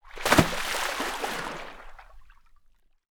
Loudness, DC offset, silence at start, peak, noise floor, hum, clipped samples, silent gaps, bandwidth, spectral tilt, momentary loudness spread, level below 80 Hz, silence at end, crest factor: -26 LUFS; under 0.1%; 0.05 s; -2 dBFS; -60 dBFS; none; under 0.1%; none; over 20 kHz; -3.5 dB/octave; 19 LU; -46 dBFS; 0.8 s; 28 dB